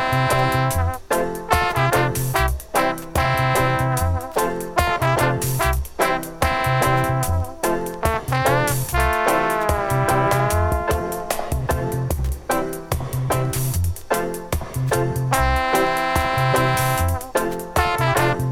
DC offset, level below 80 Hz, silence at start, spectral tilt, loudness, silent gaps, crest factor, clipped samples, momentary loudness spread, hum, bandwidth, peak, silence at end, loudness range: under 0.1%; -30 dBFS; 0 s; -5 dB/octave; -21 LUFS; none; 18 dB; under 0.1%; 6 LU; none; 18 kHz; -2 dBFS; 0 s; 4 LU